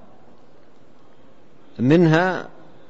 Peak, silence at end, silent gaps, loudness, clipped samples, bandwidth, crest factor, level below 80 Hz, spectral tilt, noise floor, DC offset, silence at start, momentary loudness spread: -6 dBFS; 0.45 s; none; -18 LUFS; under 0.1%; 7.8 kHz; 18 dB; -60 dBFS; -8 dB/octave; -53 dBFS; 1%; 1.8 s; 26 LU